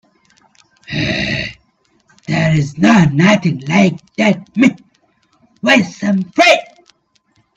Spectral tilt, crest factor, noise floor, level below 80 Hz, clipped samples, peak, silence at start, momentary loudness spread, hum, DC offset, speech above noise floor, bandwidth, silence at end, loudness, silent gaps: -5.5 dB/octave; 16 dB; -59 dBFS; -46 dBFS; under 0.1%; 0 dBFS; 0.9 s; 10 LU; none; under 0.1%; 47 dB; 8.8 kHz; 0.9 s; -13 LUFS; none